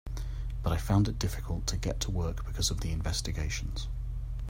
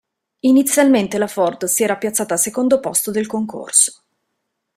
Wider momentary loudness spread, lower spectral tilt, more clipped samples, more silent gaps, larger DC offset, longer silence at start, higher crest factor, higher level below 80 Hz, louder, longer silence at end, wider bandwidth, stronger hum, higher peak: about the same, 10 LU vs 8 LU; first, -4.5 dB/octave vs -3 dB/octave; neither; neither; neither; second, 0.05 s vs 0.45 s; about the same, 18 dB vs 18 dB; first, -36 dBFS vs -60 dBFS; second, -33 LUFS vs -16 LUFS; second, 0 s vs 0.85 s; about the same, 16 kHz vs 16 kHz; neither; second, -12 dBFS vs 0 dBFS